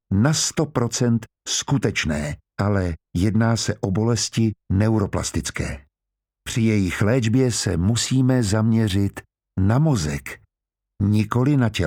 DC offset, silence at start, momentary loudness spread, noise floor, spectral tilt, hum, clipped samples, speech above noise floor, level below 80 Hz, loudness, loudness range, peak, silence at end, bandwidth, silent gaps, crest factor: under 0.1%; 0.1 s; 9 LU; -85 dBFS; -5.5 dB/octave; none; under 0.1%; 65 dB; -42 dBFS; -21 LUFS; 2 LU; -4 dBFS; 0 s; 16 kHz; none; 16 dB